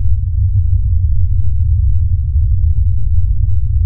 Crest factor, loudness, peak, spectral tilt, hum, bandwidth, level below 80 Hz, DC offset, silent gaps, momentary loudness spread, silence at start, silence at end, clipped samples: 10 dB; -16 LUFS; -2 dBFS; -23 dB/octave; none; 0.3 kHz; -14 dBFS; under 0.1%; none; 2 LU; 0 s; 0 s; under 0.1%